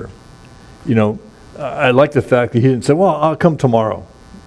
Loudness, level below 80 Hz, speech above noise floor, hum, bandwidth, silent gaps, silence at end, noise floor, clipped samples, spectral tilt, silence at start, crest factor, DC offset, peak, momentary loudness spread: -14 LUFS; -46 dBFS; 26 dB; none; 11 kHz; none; 0.05 s; -40 dBFS; under 0.1%; -7.5 dB/octave; 0 s; 16 dB; under 0.1%; 0 dBFS; 15 LU